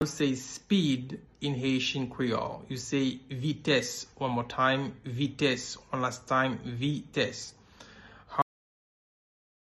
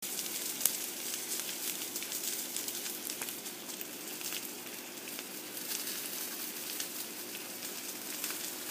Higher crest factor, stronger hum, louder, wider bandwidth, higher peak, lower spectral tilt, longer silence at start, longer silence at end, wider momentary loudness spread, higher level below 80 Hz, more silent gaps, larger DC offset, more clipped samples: second, 20 dB vs 38 dB; neither; first, -31 LUFS vs -37 LUFS; second, 12.5 kHz vs 16 kHz; second, -12 dBFS vs 0 dBFS; first, -5 dB/octave vs 0 dB/octave; about the same, 0 s vs 0 s; first, 1.3 s vs 0 s; first, 9 LU vs 6 LU; first, -62 dBFS vs -88 dBFS; neither; neither; neither